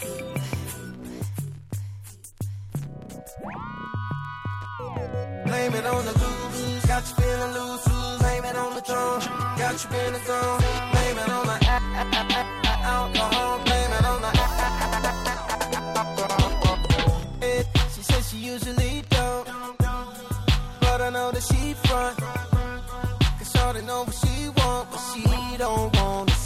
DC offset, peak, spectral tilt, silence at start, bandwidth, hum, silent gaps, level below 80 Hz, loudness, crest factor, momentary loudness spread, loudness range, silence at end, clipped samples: under 0.1%; -6 dBFS; -4.5 dB/octave; 0 s; 16 kHz; none; none; -30 dBFS; -25 LUFS; 20 dB; 12 LU; 10 LU; 0 s; under 0.1%